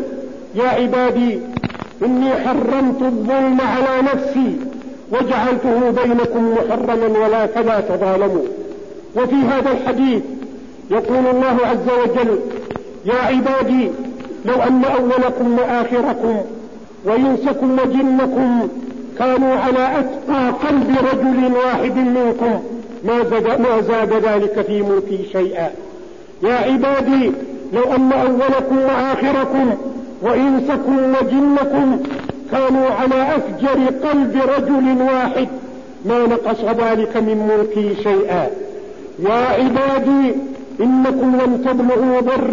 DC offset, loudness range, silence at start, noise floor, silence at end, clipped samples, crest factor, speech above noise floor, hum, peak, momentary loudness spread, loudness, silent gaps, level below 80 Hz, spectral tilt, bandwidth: 0.8%; 2 LU; 0 s; -36 dBFS; 0 s; under 0.1%; 12 dB; 21 dB; none; -4 dBFS; 10 LU; -16 LUFS; none; -48 dBFS; -7 dB/octave; 7.4 kHz